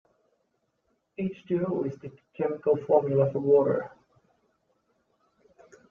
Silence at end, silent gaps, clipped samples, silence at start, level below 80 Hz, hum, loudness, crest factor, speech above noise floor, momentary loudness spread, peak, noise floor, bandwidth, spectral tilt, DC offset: 2 s; none; under 0.1%; 1.2 s; -72 dBFS; none; -26 LUFS; 20 dB; 49 dB; 21 LU; -8 dBFS; -75 dBFS; 3.7 kHz; -10 dB/octave; under 0.1%